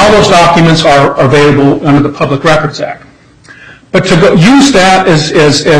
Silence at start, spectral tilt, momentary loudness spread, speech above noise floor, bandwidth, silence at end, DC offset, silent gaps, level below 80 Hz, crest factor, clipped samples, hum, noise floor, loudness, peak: 0 s; -5 dB/octave; 8 LU; 31 dB; 11.5 kHz; 0 s; under 0.1%; none; -30 dBFS; 6 dB; 0.6%; none; -36 dBFS; -6 LUFS; 0 dBFS